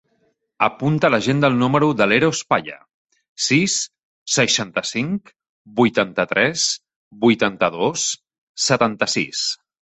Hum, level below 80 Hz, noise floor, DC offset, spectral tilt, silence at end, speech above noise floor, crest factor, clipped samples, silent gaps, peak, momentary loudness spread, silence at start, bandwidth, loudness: none; -58 dBFS; -66 dBFS; under 0.1%; -3.5 dB/octave; 0.25 s; 47 dB; 20 dB; under 0.1%; 2.94-3.05 s, 3.29-3.36 s, 4.05-4.26 s, 5.49-5.65 s, 6.96-7.11 s, 8.38-8.55 s; 0 dBFS; 9 LU; 0.6 s; 8.4 kHz; -19 LUFS